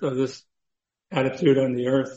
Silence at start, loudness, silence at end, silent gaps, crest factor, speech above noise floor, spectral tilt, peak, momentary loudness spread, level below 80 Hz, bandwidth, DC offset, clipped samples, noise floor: 0 s; -23 LUFS; 0 s; none; 16 dB; 61 dB; -7 dB/octave; -8 dBFS; 9 LU; -64 dBFS; 8 kHz; under 0.1%; under 0.1%; -84 dBFS